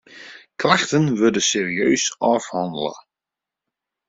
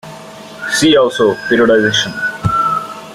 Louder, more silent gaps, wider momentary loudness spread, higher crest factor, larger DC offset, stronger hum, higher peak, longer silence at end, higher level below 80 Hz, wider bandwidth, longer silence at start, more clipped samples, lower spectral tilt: second, -19 LUFS vs -13 LUFS; neither; second, 14 LU vs 17 LU; first, 20 dB vs 12 dB; neither; neither; about the same, 0 dBFS vs -2 dBFS; first, 1.1 s vs 0 s; second, -62 dBFS vs -44 dBFS; second, 8 kHz vs 15 kHz; about the same, 0.1 s vs 0.05 s; neither; about the same, -3.5 dB/octave vs -4 dB/octave